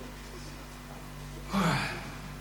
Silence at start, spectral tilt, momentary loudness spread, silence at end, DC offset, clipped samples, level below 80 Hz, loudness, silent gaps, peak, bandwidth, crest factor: 0 s; -5 dB/octave; 16 LU; 0 s; under 0.1%; under 0.1%; -48 dBFS; -35 LUFS; none; -18 dBFS; over 20 kHz; 18 dB